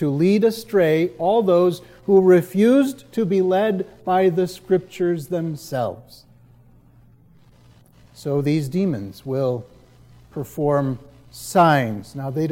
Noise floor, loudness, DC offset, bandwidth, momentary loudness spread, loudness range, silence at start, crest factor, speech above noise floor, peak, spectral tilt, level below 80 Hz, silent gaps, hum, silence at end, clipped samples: -51 dBFS; -20 LUFS; under 0.1%; 16.5 kHz; 14 LU; 10 LU; 0 s; 16 dB; 32 dB; -4 dBFS; -7 dB/octave; -58 dBFS; none; none; 0 s; under 0.1%